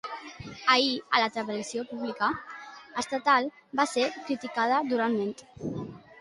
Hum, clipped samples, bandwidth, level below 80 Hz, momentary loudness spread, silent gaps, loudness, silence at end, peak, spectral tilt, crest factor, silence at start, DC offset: none; under 0.1%; 11.5 kHz; -66 dBFS; 15 LU; none; -28 LUFS; 0.2 s; -8 dBFS; -3.5 dB/octave; 22 dB; 0.05 s; under 0.1%